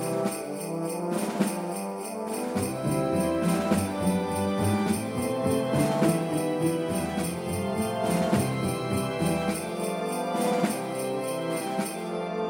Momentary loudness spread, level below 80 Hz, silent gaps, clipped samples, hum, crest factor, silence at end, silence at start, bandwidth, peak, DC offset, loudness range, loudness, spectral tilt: 7 LU; -56 dBFS; none; under 0.1%; none; 18 dB; 0 s; 0 s; 17 kHz; -10 dBFS; under 0.1%; 3 LU; -28 LUFS; -5.5 dB/octave